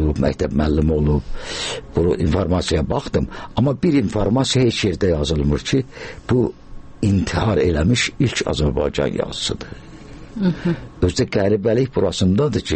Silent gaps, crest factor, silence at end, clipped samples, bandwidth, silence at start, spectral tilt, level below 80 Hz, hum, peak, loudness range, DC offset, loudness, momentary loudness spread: none; 16 dB; 0 s; under 0.1%; 8.8 kHz; 0 s; -6 dB/octave; -30 dBFS; none; -4 dBFS; 2 LU; under 0.1%; -19 LUFS; 7 LU